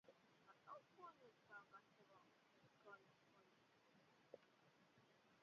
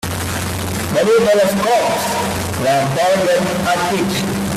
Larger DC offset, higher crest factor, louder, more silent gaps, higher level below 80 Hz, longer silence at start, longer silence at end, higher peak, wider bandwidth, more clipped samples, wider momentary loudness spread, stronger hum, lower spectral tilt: neither; first, 24 dB vs 12 dB; second, -66 LUFS vs -16 LUFS; neither; second, under -90 dBFS vs -44 dBFS; about the same, 0.05 s vs 0.05 s; about the same, 0 s vs 0 s; second, -46 dBFS vs -4 dBFS; second, 6.8 kHz vs 16 kHz; neither; second, 5 LU vs 8 LU; neither; second, -2.5 dB/octave vs -4.5 dB/octave